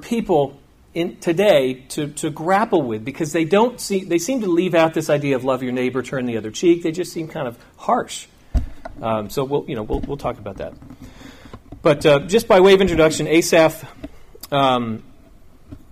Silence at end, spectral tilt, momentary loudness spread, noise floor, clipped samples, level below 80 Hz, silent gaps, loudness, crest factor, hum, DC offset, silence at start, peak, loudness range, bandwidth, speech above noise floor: 0.15 s; -5 dB/octave; 15 LU; -45 dBFS; under 0.1%; -38 dBFS; none; -19 LUFS; 16 dB; none; under 0.1%; 0 s; -4 dBFS; 9 LU; 15.5 kHz; 27 dB